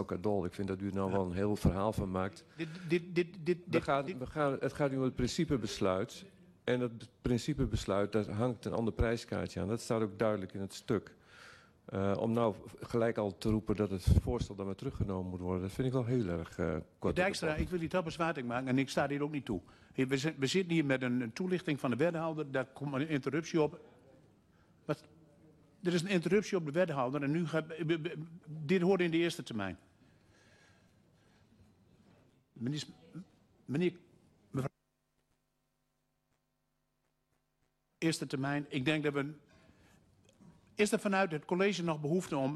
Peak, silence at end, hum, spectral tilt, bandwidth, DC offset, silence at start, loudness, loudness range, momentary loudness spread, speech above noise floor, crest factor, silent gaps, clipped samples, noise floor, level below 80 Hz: -16 dBFS; 0 s; none; -6 dB/octave; 13 kHz; under 0.1%; 0 s; -35 LUFS; 8 LU; 10 LU; 47 dB; 20 dB; none; under 0.1%; -81 dBFS; -52 dBFS